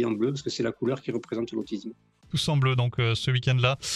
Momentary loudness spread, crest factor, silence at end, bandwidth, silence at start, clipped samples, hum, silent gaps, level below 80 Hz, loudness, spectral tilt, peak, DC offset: 9 LU; 18 dB; 0 s; 12.5 kHz; 0 s; under 0.1%; none; none; -56 dBFS; -27 LUFS; -5.5 dB/octave; -10 dBFS; under 0.1%